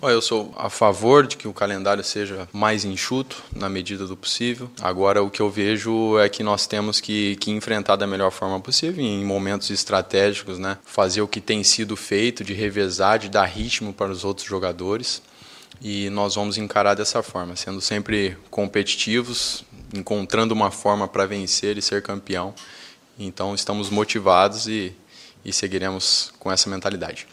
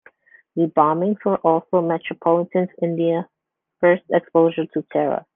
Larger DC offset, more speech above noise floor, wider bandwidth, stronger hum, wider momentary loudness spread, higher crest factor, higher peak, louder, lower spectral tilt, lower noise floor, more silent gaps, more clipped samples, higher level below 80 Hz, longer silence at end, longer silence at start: neither; second, 23 dB vs 33 dB; first, 15 kHz vs 3.7 kHz; neither; first, 10 LU vs 6 LU; about the same, 22 dB vs 18 dB; about the same, 0 dBFS vs -2 dBFS; about the same, -22 LUFS vs -20 LUFS; second, -3.5 dB/octave vs -10.5 dB/octave; second, -46 dBFS vs -52 dBFS; neither; neither; first, -52 dBFS vs -66 dBFS; about the same, 0.1 s vs 0.15 s; second, 0 s vs 0.55 s